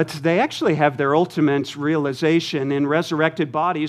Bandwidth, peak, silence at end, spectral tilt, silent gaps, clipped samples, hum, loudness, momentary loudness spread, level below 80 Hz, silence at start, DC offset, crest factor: 14 kHz; -2 dBFS; 0 s; -6 dB/octave; none; under 0.1%; none; -20 LUFS; 3 LU; -68 dBFS; 0 s; under 0.1%; 18 dB